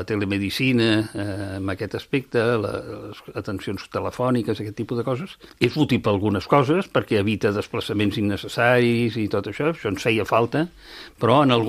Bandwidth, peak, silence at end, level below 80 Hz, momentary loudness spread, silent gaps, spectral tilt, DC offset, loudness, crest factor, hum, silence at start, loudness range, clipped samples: 15.5 kHz; 0 dBFS; 0 s; -54 dBFS; 11 LU; none; -6.5 dB/octave; under 0.1%; -22 LUFS; 22 dB; none; 0 s; 5 LU; under 0.1%